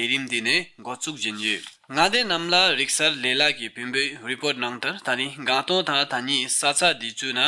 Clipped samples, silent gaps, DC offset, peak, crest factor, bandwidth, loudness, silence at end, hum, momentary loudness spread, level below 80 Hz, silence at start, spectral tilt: under 0.1%; none; under 0.1%; -6 dBFS; 18 dB; 11.5 kHz; -22 LUFS; 0 s; none; 9 LU; -64 dBFS; 0 s; -1.5 dB/octave